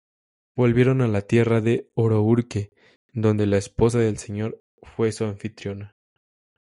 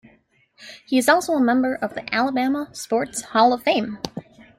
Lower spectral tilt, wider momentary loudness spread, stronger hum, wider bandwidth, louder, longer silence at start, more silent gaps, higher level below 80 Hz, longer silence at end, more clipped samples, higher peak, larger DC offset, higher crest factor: first, -7.5 dB/octave vs -3.5 dB/octave; about the same, 15 LU vs 15 LU; neither; second, 11.5 kHz vs 15.5 kHz; about the same, -22 LUFS vs -21 LUFS; about the same, 0.55 s vs 0.6 s; first, 2.96-3.09 s, 4.60-4.78 s vs none; first, -50 dBFS vs -62 dBFS; first, 0.75 s vs 0.4 s; neither; about the same, -4 dBFS vs -4 dBFS; neither; about the same, 18 dB vs 18 dB